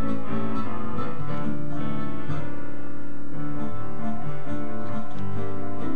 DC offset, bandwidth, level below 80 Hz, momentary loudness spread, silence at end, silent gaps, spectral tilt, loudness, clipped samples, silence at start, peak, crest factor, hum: 20%; 9.2 kHz; -54 dBFS; 7 LU; 0 s; none; -8.5 dB/octave; -33 LUFS; under 0.1%; 0 s; -10 dBFS; 16 dB; none